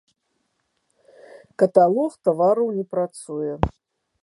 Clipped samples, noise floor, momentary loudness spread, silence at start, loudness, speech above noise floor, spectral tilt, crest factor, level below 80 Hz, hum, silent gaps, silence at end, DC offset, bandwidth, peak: under 0.1%; -73 dBFS; 12 LU; 1.6 s; -21 LUFS; 52 dB; -7.5 dB/octave; 22 dB; -44 dBFS; none; none; 0.55 s; under 0.1%; 11.5 kHz; 0 dBFS